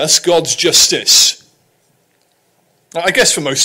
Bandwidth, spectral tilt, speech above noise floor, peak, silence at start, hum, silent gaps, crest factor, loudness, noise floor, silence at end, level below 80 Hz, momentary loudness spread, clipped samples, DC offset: 16.5 kHz; -0.5 dB/octave; 46 dB; 0 dBFS; 0 s; none; none; 14 dB; -10 LUFS; -58 dBFS; 0 s; -50 dBFS; 11 LU; under 0.1%; under 0.1%